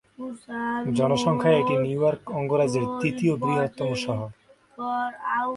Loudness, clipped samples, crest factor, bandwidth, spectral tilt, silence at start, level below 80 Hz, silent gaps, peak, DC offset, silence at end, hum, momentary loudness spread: -25 LUFS; under 0.1%; 16 dB; 11.5 kHz; -6.5 dB/octave; 0.2 s; -60 dBFS; none; -8 dBFS; under 0.1%; 0 s; none; 11 LU